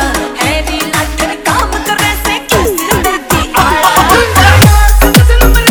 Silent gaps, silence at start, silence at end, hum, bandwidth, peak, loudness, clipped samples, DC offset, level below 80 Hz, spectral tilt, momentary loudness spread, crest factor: none; 0 s; 0 s; none; over 20 kHz; 0 dBFS; -9 LUFS; 2%; under 0.1%; -14 dBFS; -4 dB/octave; 7 LU; 8 dB